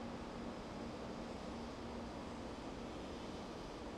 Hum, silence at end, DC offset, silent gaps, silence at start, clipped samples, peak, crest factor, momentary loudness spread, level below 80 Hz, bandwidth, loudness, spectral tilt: none; 0 s; under 0.1%; none; 0 s; under 0.1%; -34 dBFS; 12 dB; 1 LU; -58 dBFS; 13.5 kHz; -48 LUFS; -5.5 dB/octave